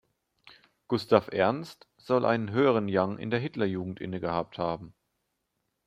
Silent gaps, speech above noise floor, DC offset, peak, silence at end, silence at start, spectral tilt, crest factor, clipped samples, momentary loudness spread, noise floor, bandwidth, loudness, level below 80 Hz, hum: none; 52 dB; under 0.1%; -4 dBFS; 0.95 s; 0.9 s; -7.5 dB/octave; 26 dB; under 0.1%; 10 LU; -80 dBFS; 14 kHz; -28 LUFS; -66 dBFS; none